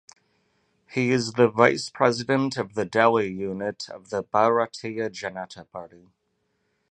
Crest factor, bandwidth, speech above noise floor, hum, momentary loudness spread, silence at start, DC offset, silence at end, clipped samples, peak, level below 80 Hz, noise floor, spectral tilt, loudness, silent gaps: 24 dB; 9.4 kHz; 49 dB; none; 16 LU; 0.9 s; under 0.1%; 1.05 s; under 0.1%; 0 dBFS; -64 dBFS; -73 dBFS; -5.5 dB/octave; -24 LUFS; none